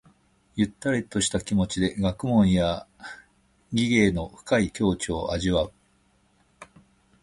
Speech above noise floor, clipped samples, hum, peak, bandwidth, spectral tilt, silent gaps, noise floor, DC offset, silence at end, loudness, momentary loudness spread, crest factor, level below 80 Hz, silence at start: 40 dB; under 0.1%; none; -6 dBFS; 11.5 kHz; -5 dB/octave; none; -64 dBFS; under 0.1%; 0.6 s; -25 LUFS; 13 LU; 20 dB; -44 dBFS; 0.55 s